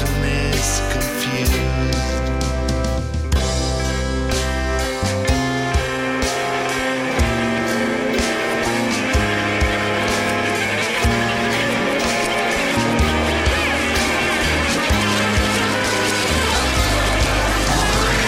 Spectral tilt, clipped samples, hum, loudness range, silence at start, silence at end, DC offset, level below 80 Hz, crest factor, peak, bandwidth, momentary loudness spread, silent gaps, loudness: -4 dB/octave; under 0.1%; none; 3 LU; 0 s; 0 s; under 0.1%; -26 dBFS; 14 dB; -4 dBFS; 16 kHz; 4 LU; none; -18 LUFS